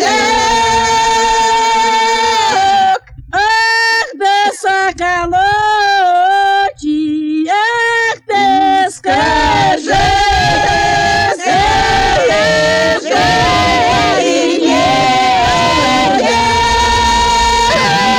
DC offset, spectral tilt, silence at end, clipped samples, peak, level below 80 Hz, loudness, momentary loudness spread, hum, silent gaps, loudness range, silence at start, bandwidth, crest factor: under 0.1%; -3 dB/octave; 0 s; under 0.1%; 0 dBFS; -30 dBFS; -11 LUFS; 3 LU; none; none; 2 LU; 0 s; 18.5 kHz; 10 dB